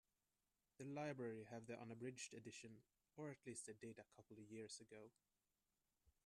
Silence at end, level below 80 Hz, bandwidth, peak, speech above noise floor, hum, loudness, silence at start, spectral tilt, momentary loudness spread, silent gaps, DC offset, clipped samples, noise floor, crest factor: 0.15 s; -90 dBFS; 13 kHz; -38 dBFS; over 34 dB; none; -56 LUFS; 0.8 s; -4.5 dB/octave; 14 LU; none; under 0.1%; under 0.1%; under -90 dBFS; 18 dB